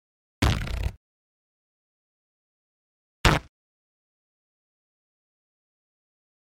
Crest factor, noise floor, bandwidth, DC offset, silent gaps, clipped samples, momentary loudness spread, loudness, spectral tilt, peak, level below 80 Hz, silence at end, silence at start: 30 dB; under -90 dBFS; 16.5 kHz; under 0.1%; 0.97-3.24 s; under 0.1%; 10 LU; -26 LUFS; -4.5 dB/octave; -2 dBFS; -38 dBFS; 3 s; 0.4 s